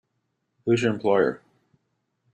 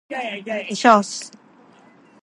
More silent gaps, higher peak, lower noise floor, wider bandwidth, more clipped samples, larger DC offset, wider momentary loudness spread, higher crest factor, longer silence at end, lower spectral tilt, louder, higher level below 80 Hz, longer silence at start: neither; second, -8 dBFS vs 0 dBFS; first, -76 dBFS vs -51 dBFS; second, 9 kHz vs 11.5 kHz; neither; neither; second, 11 LU vs 16 LU; about the same, 18 dB vs 22 dB; about the same, 1 s vs 0.95 s; first, -6.5 dB/octave vs -3.5 dB/octave; second, -24 LUFS vs -19 LUFS; first, -66 dBFS vs -72 dBFS; first, 0.65 s vs 0.1 s